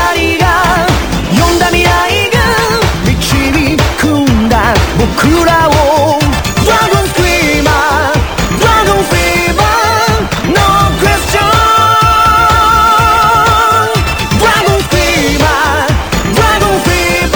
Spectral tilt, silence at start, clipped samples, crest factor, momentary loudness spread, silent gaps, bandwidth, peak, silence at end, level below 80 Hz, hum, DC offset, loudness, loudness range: -4.5 dB/octave; 0 s; 0.4%; 8 dB; 5 LU; none; over 20 kHz; 0 dBFS; 0 s; -20 dBFS; none; 1%; -9 LUFS; 2 LU